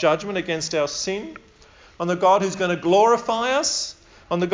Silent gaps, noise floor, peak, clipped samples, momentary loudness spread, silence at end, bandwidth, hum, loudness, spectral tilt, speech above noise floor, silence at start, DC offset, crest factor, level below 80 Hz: none; -50 dBFS; -6 dBFS; under 0.1%; 12 LU; 0 s; 7.8 kHz; none; -21 LUFS; -3.5 dB/octave; 29 dB; 0 s; under 0.1%; 16 dB; -56 dBFS